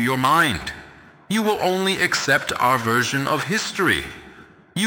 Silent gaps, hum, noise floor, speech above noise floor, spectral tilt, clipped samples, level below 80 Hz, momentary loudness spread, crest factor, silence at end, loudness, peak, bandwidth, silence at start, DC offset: none; none; -46 dBFS; 26 dB; -3.5 dB/octave; under 0.1%; -50 dBFS; 14 LU; 18 dB; 0 s; -20 LUFS; -4 dBFS; 18.5 kHz; 0 s; under 0.1%